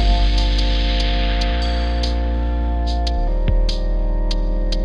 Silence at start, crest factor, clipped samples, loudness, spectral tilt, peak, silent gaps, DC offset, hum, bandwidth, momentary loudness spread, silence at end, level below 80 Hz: 0 s; 12 dB; under 0.1%; -21 LUFS; -6 dB/octave; -6 dBFS; none; under 0.1%; none; 7.6 kHz; 4 LU; 0 s; -18 dBFS